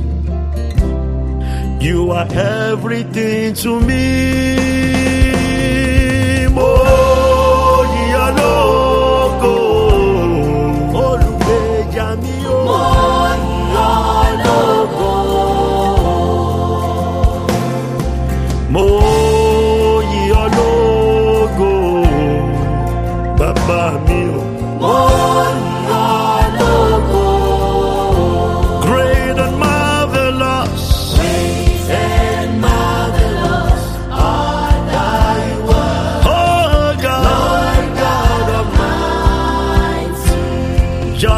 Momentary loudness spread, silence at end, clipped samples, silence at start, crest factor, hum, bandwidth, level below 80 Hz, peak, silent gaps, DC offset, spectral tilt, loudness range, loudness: 6 LU; 0 s; under 0.1%; 0 s; 12 dB; none; 15.5 kHz; -18 dBFS; 0 dBFS; none; under 0.1%; -6 dB/octave; 3 LU; -14 LUFS